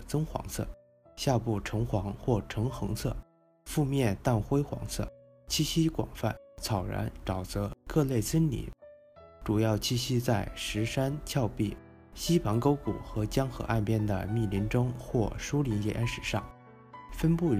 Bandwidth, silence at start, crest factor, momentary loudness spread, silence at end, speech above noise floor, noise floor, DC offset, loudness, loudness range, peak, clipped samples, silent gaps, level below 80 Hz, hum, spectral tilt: 15.5 kHz; 0 s; 18 dB; 9 LU; 0 s; 24 dB; -54 dBFS; under 0.1%; -31 LUFS; 2 LU; -12 dBFS; under 0.1%; none; -44 dBFS; none; -6 dB/octave